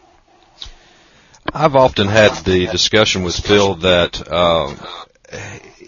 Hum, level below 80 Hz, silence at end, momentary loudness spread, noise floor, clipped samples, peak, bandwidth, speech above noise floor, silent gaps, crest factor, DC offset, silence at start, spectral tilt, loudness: none; -38 dBFS; 0.3 s; 22 LU; -51 dBFS; under 0.1%; 0 dBFS; 7.4 kHz; 36 dB; none; 16 dB; under 0.1%; 0.6 s; -4 dB/octave; -14 LUFS